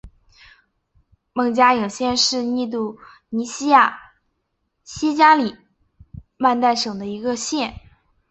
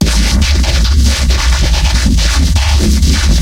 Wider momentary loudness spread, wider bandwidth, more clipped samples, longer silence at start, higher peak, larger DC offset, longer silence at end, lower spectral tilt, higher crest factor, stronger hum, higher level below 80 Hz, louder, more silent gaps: first, 14 LU vs 1 LU; second, 8.4 kHz vs 16 kHz; neither; about the same, 0.05 s vs 0 s; about the same, -2 dBFS vs 0 dBFS; neither; first, 0.55 s vs 0 s; about the same, -3 dB/octave vs -4 dB/octave; first, 20 dB vs 10 dB; neither; second, -52 dBFS vs -10 dBFS; second, -19 LUFS vs -11 LUFS; neither